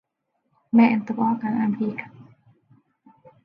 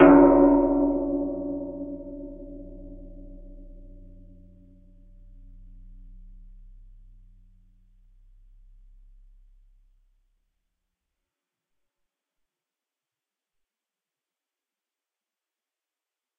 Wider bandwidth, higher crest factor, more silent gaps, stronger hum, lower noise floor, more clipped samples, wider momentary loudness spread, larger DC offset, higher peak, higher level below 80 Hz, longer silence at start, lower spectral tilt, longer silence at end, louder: first, 5.2 kHz vs 3.1 kHz; second, 18 dB vs 26 dB; neither; neither; second, -75 dBFS vs under -90 dBFS; neither; second, 14 LU vs 30 LU; neither; second, -6 dBFS vs -2 dBFS; second, -72 dBFS vs -46 dBFS; first, 0.75 s vs 0 s; first, -9 dB/octave vs -7.5 dB/octave; second, 1.2 s vs 12.75 s; about the same, -22 LUFS vs -21 LUFS